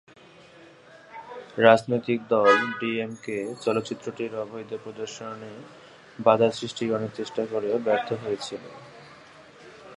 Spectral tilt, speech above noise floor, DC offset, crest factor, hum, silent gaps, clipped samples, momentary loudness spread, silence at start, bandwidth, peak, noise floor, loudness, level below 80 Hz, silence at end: -5 dB/octave; 26 dB; under 0.1%; 24 dB; none; none; under 0.1%; 24 LU; 0.6 s; 11 kHz; -2 dBFS; -51 dBFS; -25 LUFS; -70 dBFS; 0 s